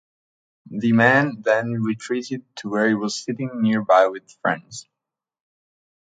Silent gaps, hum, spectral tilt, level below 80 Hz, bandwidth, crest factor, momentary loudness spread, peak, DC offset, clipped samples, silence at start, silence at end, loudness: none; none; -5.5 dB/octave; -66 dBFS; 9.2 kHz; 20 dB; 14 LU; -2 dBFS; under 0.1%; under 0.1%; 0.65 s; 1.3 s; -21 LUFS